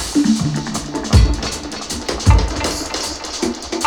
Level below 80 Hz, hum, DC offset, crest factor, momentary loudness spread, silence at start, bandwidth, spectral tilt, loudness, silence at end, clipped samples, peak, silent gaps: -22 dBFS; none; under 0.1%; 16 dB; 9 LU; 0 s; 17 kHz; -4.5 dB/octave; -18 LUFS; 0 s; under 0.1%; 0 dBFS; none